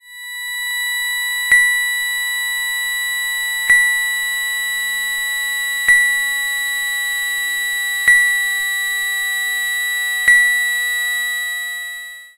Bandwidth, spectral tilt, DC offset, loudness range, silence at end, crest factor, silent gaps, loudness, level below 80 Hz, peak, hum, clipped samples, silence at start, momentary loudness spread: 16 kHz; 3.5 dB/octave; under 0.1%; 2 LU; 0.1 s; 16 dB; none; -16 LUFS; -54 dBFS; -2 dBFS; none; under 0.1%; 0.05 s; 8 LU